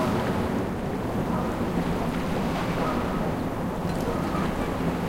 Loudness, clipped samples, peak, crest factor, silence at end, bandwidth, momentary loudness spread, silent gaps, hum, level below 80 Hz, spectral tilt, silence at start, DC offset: -27 LUFS; under 0.1%; -14 dBFS; 14 dB; 0 s; 16 kHz; 3 LU; none; none; -40 dBFS; -7 dB/octave; 0 s; under 0.1%